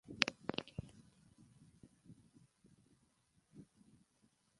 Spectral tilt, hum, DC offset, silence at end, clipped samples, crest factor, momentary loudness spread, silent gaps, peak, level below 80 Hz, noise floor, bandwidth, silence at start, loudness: -3 dB/octave; none; under 0.1%; 0.95 s; under 0.1%; 44 dB; 28 LU; none; -6 dBFS; -70 dBFS; -77 dBFS; 11.5 kHz; 0.05 s; -41 LUFS